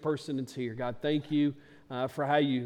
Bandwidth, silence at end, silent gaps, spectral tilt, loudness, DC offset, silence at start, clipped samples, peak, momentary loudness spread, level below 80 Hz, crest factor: 12 kHz; 0 s; none; -7 dB/octave; -32 LUFS; under 0.1%; 0 s; under 0.1%; -14 dBFS; 9 LU; -68 dBFS; 18 dB